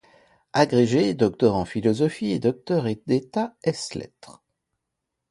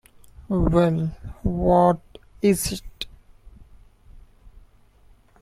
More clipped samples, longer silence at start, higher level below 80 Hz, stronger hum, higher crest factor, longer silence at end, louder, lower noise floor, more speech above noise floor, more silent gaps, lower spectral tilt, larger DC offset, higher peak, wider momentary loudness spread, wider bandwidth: neither; first, 0.55 s vs 0.4 s; second, -56 dBFS vs -38 dBFS; neither; about the same, 20 dB vs 20 dB; first, 1 s vs 0.85 s; about the same, -23 LUFS vs -22 LUFS; first, -82 dBFS vs -54 dBFS; first, 59 dB vs 34 dB; neither; about the same, -6.5 dB/octave vs -6.5 dB/octave; neither; about the same, -4 dBFS vs -4 dBFS; second, 10 LU vs 16 LU; second, 11.5 kHz vs 16 kHz